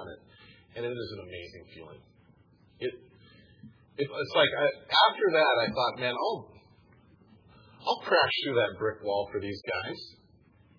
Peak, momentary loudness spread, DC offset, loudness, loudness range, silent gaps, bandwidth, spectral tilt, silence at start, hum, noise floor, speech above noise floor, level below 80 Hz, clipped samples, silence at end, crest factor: -10 dBFS; 22 LU; under 0.1%; -28 LUFS; 15 LU; none; 5.4 kHz; -5 dB/octave; 0 s; none; -61 dBFS; 32 dB; -68 dBFS; under 0.1%; 0.7 s; 22 dB